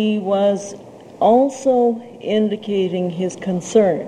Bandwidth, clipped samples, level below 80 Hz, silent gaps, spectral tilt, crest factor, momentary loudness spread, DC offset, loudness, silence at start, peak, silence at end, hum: 10.5 kHz; under 0.1%; -64 dBFS; none; -6 dB/octave; 16 dB; 10 LU; under 0.1%; -18 LUFS; 0 s; -2 dBFS; 0 s; none